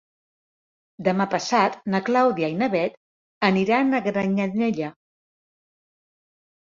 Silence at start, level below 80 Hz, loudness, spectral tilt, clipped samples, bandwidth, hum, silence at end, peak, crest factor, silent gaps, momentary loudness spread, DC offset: 1 s; -66 dBFS; -22 LUFS; -6 dB/octave; under 0.1%; 7.6 kHz; none; 1.85 s; -4 dBFS; 20 dB; 2.97-3.41 s; 6 LU; under 0.1%